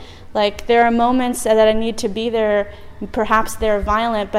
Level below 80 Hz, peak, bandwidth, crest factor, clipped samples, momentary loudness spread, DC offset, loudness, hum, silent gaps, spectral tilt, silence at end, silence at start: -34 dBFS; -2 dBFS; 16 kHz; 14 dB; under 0.1%; 9 LU; under 0.1%; -17 LUFS; none; none; -4.5 dB/octave; 0 s; 0 s